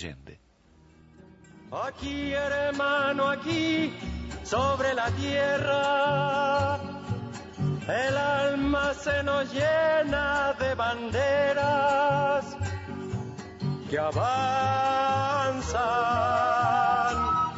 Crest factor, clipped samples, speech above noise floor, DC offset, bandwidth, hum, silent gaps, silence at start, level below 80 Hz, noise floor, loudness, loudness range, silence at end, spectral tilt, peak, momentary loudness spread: 12 dB; under 0.1%; 33 dB; under 0.1%; 8 kHz; none; none; 0 s; -48 dBFS; -59 dBFS; -26 LUFS; 3 LU; 0 s; -5.5 dB/octave; -14 dBFS; 11 LU